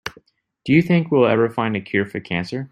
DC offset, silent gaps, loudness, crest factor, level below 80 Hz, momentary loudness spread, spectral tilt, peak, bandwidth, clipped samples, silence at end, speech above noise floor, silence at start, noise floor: under 0.1%; none; -19 LUFS; 18 dB; -56 dBFS; 9 LU; -7.5 dB/octave; -2 dBFS; 9.8 kHz; under 0.1%; 0.05 s; 36 dB; 0.05 s; -54 dBFS